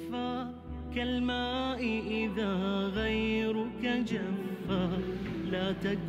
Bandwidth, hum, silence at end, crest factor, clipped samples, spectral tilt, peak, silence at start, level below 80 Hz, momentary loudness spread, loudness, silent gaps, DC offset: 15 kHz; none; 0 s; 12 dB; under 0.1%; -6.5 dB/octave; -20 dBFS; 0 s; -48 dBFS; 5 LU; -33 LUFS; none; under 0.1%